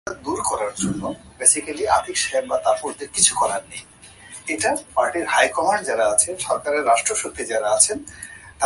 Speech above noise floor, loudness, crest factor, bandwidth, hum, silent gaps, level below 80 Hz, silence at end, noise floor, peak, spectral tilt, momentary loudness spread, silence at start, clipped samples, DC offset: 21 dB; -20 LUFS; 22 dB; 12 kHz; none; none; -52 dBFS; 0 s; -42 dBFS; 0 dBFS; -1.5 dB/octave; 14 LU; 0.05 s; under 0.1%; under 0.1%